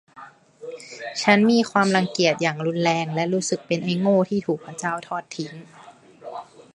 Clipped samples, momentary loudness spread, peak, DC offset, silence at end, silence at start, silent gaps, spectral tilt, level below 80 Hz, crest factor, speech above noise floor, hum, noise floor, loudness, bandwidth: under 0.1%; 20 LU; -2 dBFS; under 0.1%; 0.3 s; 0.15 s; none; -5 dB/octave; -68 dBFS; 22 dB; 24 dB; none; -46 dBFS; -22 LUFS; 11.5 kHz